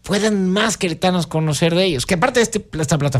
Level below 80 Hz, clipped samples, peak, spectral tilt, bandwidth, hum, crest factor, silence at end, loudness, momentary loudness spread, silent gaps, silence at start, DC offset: -42 dBFS; under 0.1%; -4 dBFS; -4.5 dB/octave; 15.5 kHz; none; 14 dB; 0 s; -18 LUFS; 4 LU; none; 0.05 s; under 0.1%